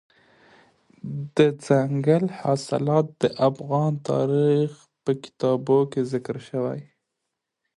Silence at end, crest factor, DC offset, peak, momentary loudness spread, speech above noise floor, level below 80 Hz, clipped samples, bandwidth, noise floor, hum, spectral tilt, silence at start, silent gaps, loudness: 0.95 s; 20 dB; under 0.1%; -4 dBFS; 10 LU; 59 dB; -66 dBFS; under 0.1%; 11 kHz; -82 dBFS; none; -7.5 dB/octave; 1.05 s; none; -23 LUFS